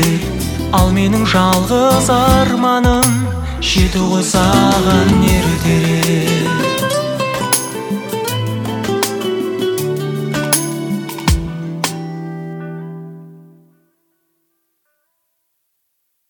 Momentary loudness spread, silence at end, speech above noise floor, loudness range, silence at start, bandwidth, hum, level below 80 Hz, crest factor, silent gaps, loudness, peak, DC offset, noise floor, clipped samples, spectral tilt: 10 LU; 2.9 s; 56 dB; 13 LU; 0 s; 19.5 kHz; none; -28 dBFS; 16 dB; none; -14 LUFS; 0 dBFS; under 0.1%; -68 dBFS; under 0.1%; -5 dB/octave